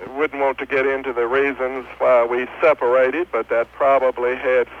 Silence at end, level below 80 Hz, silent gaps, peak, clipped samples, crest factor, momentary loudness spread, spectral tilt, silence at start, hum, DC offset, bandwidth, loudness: 0 s; -54 dBFS; none; -4 dBFS; under 0.1%; 14 dB; 6 LU; -6 dB/octave; 0 s; none; under 0.1%; 6.6 kHz; -19 LUFS